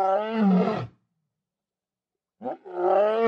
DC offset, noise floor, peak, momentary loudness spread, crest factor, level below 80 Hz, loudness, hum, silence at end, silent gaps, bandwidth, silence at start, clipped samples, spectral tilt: under 0.1%; under -90 dBFS; -10 dBFS; 16 LU; 16 dB; -70 dBFS; -24 LUFS; none; 0 s; none; 6 kHz; 0 s; under 0.1%; -9 dB/octave